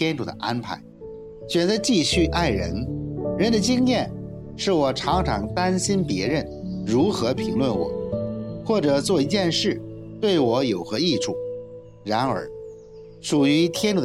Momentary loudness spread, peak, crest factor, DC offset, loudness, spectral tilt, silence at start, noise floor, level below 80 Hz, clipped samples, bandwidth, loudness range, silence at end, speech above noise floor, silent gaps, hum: 16 LU; -8 dBFS; 16 dB; under 0.1%; -23 LUFS; -5 dB/octave; 0 s; -43 dBFS; -42 dBFS; under 0.1%; 15 kHz; 2 LU; 0 s; 21 dB; none; none